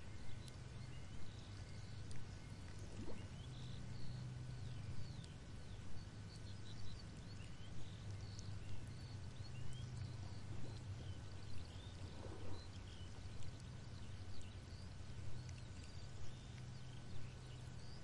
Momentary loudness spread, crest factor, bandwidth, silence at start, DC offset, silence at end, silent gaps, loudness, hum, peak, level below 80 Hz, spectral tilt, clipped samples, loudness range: 4 LU; 14 dB; 11 kHz; 0 s; 0.2%; 0 s; none; -54 LUFS; none; -34 dBFS; -60 dBFS; -5.5 dB/octave; under 0.1%; 2 LU